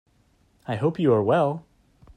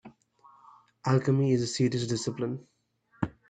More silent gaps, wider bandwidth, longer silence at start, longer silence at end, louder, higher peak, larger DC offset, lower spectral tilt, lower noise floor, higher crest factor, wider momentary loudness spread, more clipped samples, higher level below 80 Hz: neither; about the same, 9.8 kHz vs 9.4 kHz; first, 0.7 s vs 0.05 s; first, 0.55 s vs 0.2 s; first, -23 LUFS vs -29 LUFS; first, -8 dBFS vs -12 dBFS; neither; first, -9 dB/octave vs -6 dB/octave; second, -63 dBFS vs -67 dBFS; about the same, 16 dB vs 18 dB; first, 16 LU vs 11 LU; neither; about the same, -60 dBFS vs -64 dBFS